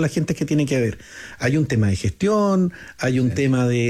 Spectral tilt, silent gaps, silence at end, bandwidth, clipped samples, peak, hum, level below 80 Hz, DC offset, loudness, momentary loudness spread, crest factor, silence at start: -6.5 dB/octave; none; 0 s; 14 kHz; under 0.1%; -8 dBFS; none; -48 dBFS; under 0.1%; -21 LUFS; 7 LU; 12 dB; 0 s